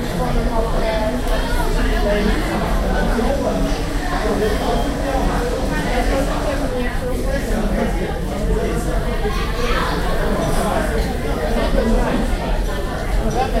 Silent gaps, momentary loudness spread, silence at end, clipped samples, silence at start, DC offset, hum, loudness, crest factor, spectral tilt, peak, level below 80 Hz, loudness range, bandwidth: none; 4 LU; 0 s; under 0.1%; 0 s; under 0.1%; none; -20 LUFS; 16 dB; -5.5 dB/octave; -2 dBFS; -22 dBFS; 1 LU; 16 kHz